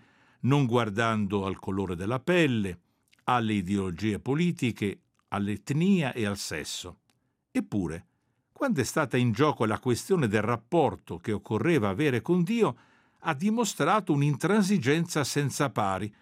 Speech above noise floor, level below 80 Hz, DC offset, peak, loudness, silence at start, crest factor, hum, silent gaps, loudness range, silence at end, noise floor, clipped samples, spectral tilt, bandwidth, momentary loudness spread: 46 dB; -64 dBFS; under 0.1%; -8 dBFS; -28 LUFS; 0.45 s; 18 dB; none; none; 4 LU; 0.1 s; -73 dBFS; under 0.1%; -6 dB/octave; 16 kHz; 9 LU